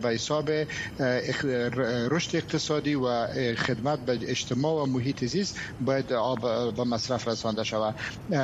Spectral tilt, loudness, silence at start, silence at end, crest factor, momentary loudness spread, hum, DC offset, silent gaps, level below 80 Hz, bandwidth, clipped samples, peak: -5 dB/octave; -28 LUFS; 0 s; 0 s; 16 dB; 3 LU; none; under 0.1%; none; -56 dBFS; 12.5 kHz; under 0.1%; -12 dBFS